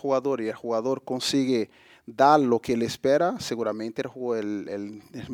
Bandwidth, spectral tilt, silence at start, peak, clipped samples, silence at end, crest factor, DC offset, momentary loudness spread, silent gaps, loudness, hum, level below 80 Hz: 17.5 kHz; -5 dB/octave; 0.05 s; -6 dBFS; under 0.1%; 0 s; 20 dB; under 0.1%; 15 LU; none; -25 LUFS; none; -64 dBFS